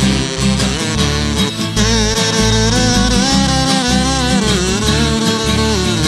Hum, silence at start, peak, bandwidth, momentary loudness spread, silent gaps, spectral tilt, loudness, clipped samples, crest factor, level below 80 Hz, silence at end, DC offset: none; 0 s; 0 dBFS; 13.5 kHz; 3 LU; none; -4 dB/octave; -13 LUFS; under 0.1%; 14 dB; -24 dBFS; 0 s; under 0.1%